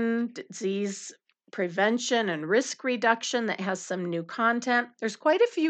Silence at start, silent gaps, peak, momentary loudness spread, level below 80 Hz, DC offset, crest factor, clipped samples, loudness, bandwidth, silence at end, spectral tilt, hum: 0 s; none; -8 dBFS; 10 LU; under -90 dBFS; under 0.1%; 20 dB; under 0.1%; -27 LUFS; 9.2 kHz; 0 s; -4 dB/octave; none